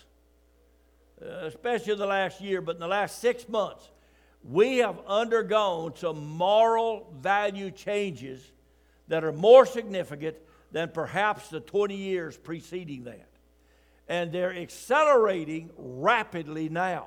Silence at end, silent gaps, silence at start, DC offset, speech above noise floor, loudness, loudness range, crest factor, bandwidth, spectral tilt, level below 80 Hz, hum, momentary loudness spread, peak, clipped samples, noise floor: 0 s; none; 1.2 s; under 0.1%; 36 dB; -26 LUFS; 7 LU; 24 dB; 15 kHz; -5 dB/octave; -64 dBFS; none; 16 LU; -4 dBFS; under 0.1%; -62 dBFS